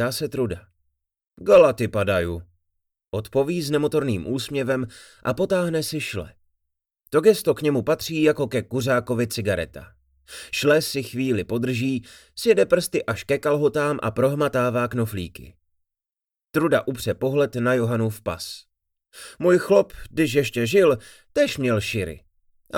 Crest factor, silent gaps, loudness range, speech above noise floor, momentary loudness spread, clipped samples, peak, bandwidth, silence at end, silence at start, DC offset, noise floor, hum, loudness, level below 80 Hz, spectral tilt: 18 dB; none; 3 LU; over 68 dB; 13 LU; under 0.1%; -4 dBFS; 18.5 kHz; 0 s; 0 s; under 0.1%; under -90 dBFS; none; -22 LUFS; -52 dBFS; -5.5 dB/octave